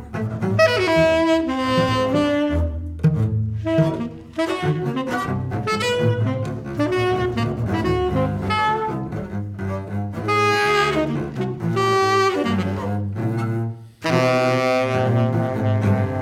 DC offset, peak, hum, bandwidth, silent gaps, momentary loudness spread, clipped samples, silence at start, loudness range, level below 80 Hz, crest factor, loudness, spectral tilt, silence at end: under 0.1%; -4 dBFS; none; 15 kHz; none; 10 LU; under 0.1%; 0 s; 3 LU; -40 dBFS; 16 dB; -21 LUFS; -6.5 dB/octave; 0 s